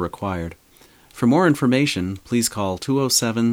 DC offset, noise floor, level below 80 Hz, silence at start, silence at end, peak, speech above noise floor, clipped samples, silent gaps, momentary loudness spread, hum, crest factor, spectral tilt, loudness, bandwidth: under 0.1%; -52 dBFS; -50 dBFS; 0 s; 0 s; -4 dBFS; 32 dB; under 0.1%; none; 10 LU; none; 16 dB; -4.5 dB/octave; -20 LUFS; 17 kHz